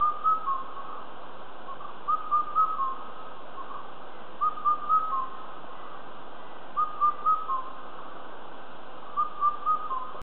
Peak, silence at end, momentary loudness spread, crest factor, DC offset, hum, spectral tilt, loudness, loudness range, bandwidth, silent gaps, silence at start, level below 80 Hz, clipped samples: -14 dBFS; 0 s; 19 LU; 16 dB; 3%; none; -6.5 dB/octave; -28 LUFS; 3 LU; 4.3 kHz; none; 0 s; -72 dBFS; under 0.1%